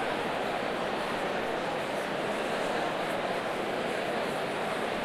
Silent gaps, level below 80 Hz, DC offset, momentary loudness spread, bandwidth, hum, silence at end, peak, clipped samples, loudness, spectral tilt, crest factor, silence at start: none; -60 dBFS; under 0.1%; 1 LU; 16.5 kHz; none; 0 s; -18 dBFS; under 0.1%; -31 LUFS; -4 dB/octave; 14 dB; 0 s